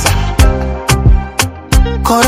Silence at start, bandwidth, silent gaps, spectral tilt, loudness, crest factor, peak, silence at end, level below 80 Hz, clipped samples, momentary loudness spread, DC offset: 0 s; 16.5 kHz; none; -4.5 dB/octave; -13 LUFS; 10 dB; 0 dBFS; 0 s; -14 dBFS; 0.8%; 5 LU; under 0.1%